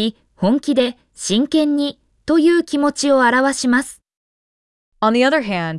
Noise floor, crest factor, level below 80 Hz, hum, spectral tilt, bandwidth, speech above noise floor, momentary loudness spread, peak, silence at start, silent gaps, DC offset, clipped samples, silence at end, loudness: under -90 dBFS; 14 dB; -56 dBFS; none; -4 dB/octave; 12 kHz; over 74 dB; 9 LU; -4 dBFS; 0 s; 4.17-4.92 s; under 0.1%; under 0.1%; 0 s; -17 LUFS